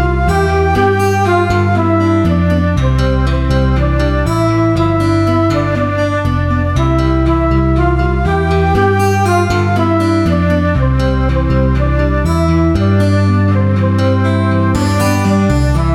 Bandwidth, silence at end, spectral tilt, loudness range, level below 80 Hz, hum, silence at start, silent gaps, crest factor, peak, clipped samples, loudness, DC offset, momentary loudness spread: 13.5 kHz; 0 s; -7.5 dB/octave; 1 LU; -20 dBFS; none; 0 s; none; 10 dB; 0 dBFS; under 0.1%; -13 LUFS; under 0.1%; 2 LU